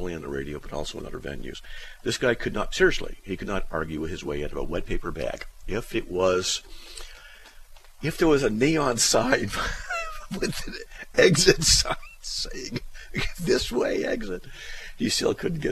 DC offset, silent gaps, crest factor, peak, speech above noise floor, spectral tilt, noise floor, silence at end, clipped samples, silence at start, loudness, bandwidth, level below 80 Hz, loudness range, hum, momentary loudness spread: under 0.1%; none; 22 dB; -4 dBFS; 21 dB; -3.5 dB/octave; -46 dBFS; 0 s; under 0.1%; 0 s; -25 LUFS; 14.5 kHz; -38 dBFS; 7 LU; none; 17 LU